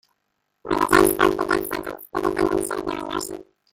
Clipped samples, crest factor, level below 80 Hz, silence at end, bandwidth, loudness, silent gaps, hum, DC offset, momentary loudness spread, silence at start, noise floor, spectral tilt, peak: under 0.1%; 22 dB; -46 dBFS; 0.3 s; 17 kHz; -22 LUFS; none; none; under 0.1%; 14 LU; 0.65 s; -74 dBFS; -4 dB/octave; 0 dBFS